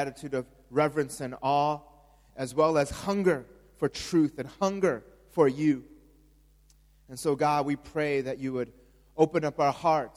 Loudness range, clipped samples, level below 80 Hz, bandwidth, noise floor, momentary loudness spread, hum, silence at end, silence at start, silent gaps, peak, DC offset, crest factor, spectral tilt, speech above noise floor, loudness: 2 LU; under 0.1%; -58 dBFS; 15.5 kHz; -60 dBFS; 10 LU; none; 0.1 s; 0 s; none; -8 dBFS; under 0.1%; 22 dB; -6 dB/octave; 33 dB; -28 LUFS